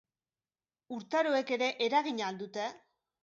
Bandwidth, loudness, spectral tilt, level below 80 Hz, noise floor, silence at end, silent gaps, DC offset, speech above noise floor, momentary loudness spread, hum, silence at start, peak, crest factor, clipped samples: 7.8 kHz; -32 LUFS; -3.5 dB/octave; -86 dBFS; under -90 dBFS; 0.45 s; none; under 0.1%; over 58 dB; 11 LU; none; 0.9 s; -16 dBFS; 18 dB; under 0.1%